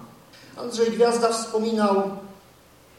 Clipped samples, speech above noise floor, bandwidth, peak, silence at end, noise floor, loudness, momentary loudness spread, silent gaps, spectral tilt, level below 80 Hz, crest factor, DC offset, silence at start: under 0.1%; 30 dB; 15 kHz; -8 dBFS; 0.65 s; -53 dBFS; -23 LUFS; 16 LU; none; -4.5 dB/octave; -66 dBFS; 18 dB; under 0.1%; 0 s